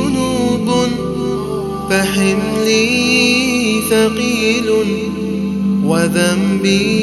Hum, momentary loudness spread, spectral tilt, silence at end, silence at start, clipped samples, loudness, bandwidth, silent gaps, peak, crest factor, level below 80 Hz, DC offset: none; 7 LU; -4.5 dB/octave; 0 s; 0 s; under 0.1%; -14 LUFS; 13.5 kHz; none; 0 dBFS; 14 dB; -40 dBFS; under 0.1%